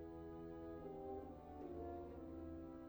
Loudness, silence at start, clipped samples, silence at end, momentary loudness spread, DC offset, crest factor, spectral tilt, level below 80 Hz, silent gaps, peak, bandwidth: -53 LUFS; 0 s; under 0.1%; 0 s; 3 LU; under 0.1%; 12 dB; -9.5 dB/octave; -64 dBFS; none; -40 dBFS; over 20 kHz